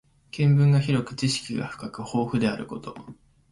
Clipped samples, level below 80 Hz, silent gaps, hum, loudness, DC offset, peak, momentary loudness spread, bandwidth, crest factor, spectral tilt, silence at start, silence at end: under 0.1%; -56 dBFS; none; none; -24 LUFS; under 0.1%; -12 dBFS; 18 LU; 11.5 kHz; 14 dB; -6.5 dB/octave; 0.35 s; 0.4 s